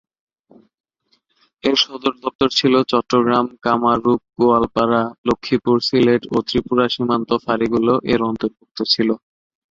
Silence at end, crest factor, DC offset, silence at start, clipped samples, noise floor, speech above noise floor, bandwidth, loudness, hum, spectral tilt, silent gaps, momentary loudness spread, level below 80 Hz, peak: 0.55 s; 18 dB; under 0.1%; 1.65 s; under 0.1%; -65 dBFS; 47 dB; 7.6 kHz; -18 LUFS; none; -5.5 dB/octave; 2.35-2.39 s, 5.18-5.24 s, 8.71-8.75 s; 7 LU; -50 dBFS; -2 dBFS